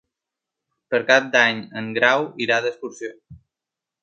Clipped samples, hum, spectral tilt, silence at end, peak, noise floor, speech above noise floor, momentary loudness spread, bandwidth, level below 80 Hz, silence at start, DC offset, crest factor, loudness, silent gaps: under 0.1%; none; -3.5 dB/octave; 0.65 s; 0 dBFS; -87 dBFS; 66 dB; 16 LU; 8.4 kHz; -64 dBFS; 0.9 s; under 0.1%; 22 dB; -19 LUFS; none